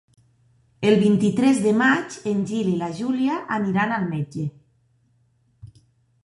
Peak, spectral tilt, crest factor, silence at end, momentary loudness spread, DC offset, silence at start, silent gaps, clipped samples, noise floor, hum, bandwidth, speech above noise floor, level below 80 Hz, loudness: -4 dBFS; -6.5 dB/octave; 18 dB; 0.6 s; 9 LU; under 0.1%; 0.8 s; none; under 0.1%; -63 dBFS; none; 11.5 kHz; 43 dB; -60 dBFS; -21 LUFS